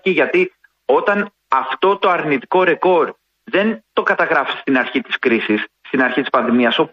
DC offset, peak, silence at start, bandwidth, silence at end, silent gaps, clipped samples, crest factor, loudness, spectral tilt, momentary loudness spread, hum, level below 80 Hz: under 0.1%; -2 dBFS; 0.05 s; 6.8 kHz; 0.05 s; none; under 0.1%; 16 dB; -17 LUFS; -6.5 dB/octave; 6 LU; none; -64 dBFS